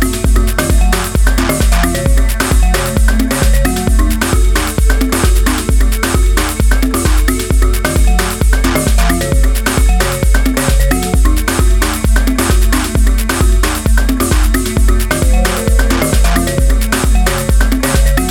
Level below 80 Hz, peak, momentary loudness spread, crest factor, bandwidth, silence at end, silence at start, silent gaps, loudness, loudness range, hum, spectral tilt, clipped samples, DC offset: -12 dBFS; 0 dBFS; 1 LU; 10 dB; 17.5 kHz; 0 s; 0 s; none; -13 LUFS; 0 LU; none; -4.5 dB/octave; under 0.1%; under 0.1%